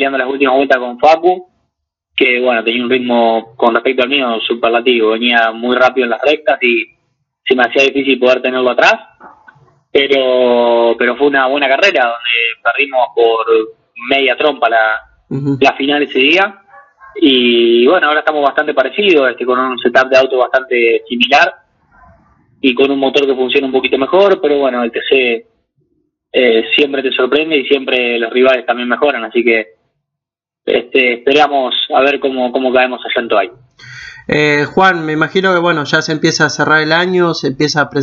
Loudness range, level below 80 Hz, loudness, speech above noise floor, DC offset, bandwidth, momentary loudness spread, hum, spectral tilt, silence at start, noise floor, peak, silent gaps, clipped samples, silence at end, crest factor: 2 LU; -56 dBFS; -12 LUFS; 72 dB; under 0.1%; 7.4 kHz; 6 LU; none; -4.5 dB/octave; 0 s; -83 dBFS; 0 dBFS; none; under 0.1%; 0 s; 12 dB